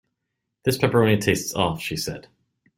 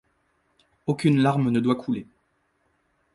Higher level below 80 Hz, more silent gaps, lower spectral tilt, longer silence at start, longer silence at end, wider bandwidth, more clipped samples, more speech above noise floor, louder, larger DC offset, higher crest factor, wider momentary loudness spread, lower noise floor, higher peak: first, -52 dBFS vs -62 dBFS; neither; second, -5 dB/octave vs -7.5 dB/octave; second, 0.65 s vs 0.85 s; second, 0.55 s vs 1.1 s; first, 16.5 kHz vs 11.5 kHz; neither; first, 58 dB vs 48 dB; about the same, -22 LUFS vs -24 LUFS; neither; about the same, 20 dB vs 18 dB; about the same, 11 LU vs 11 LU; first, -80 dBFS vs -70 dBFS; first, -4 dBFS vs -8 dBFS